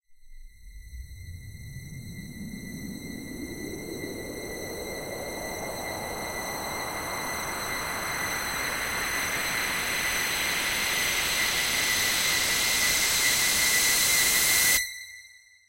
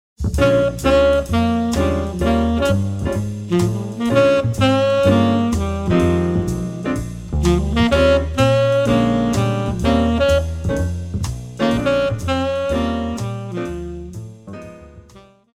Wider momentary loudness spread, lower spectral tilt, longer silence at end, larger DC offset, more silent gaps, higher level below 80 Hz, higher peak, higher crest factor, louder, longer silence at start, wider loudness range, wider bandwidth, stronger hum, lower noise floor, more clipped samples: first, 20 LU vs 11 LU; second, -0.5 dB/octave vs -6.5 dB/octave; about the same, 0.3 s vs 0.35 s; neither; neither; second, -50 dBFS vs -30 dBFS; second, -10 dBFS vs -2 dBFS; about the same, 20 dB vs 16 dB; second, -25 LUFS vs -18 LUFS; about the same, 0.1 s vs 0.2 s; first, 17 LU vs 5 LU; about the same, 16 kHz vs 15.5 kHz; neither; first, -52 dBFS vs -46 dBFS; neither